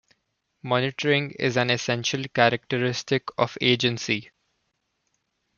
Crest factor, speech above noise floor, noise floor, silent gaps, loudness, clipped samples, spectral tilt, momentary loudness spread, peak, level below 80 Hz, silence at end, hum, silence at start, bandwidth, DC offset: 24 dB; 51 dB; -75 dBFS; none; -24 LUFS; under 0.1%; -4.5 dB/octave; 6 LU; -2 dBFS; -66 dBFS; 1.35 s; none; 0.65 s; 7.2 kHz; under 0.1%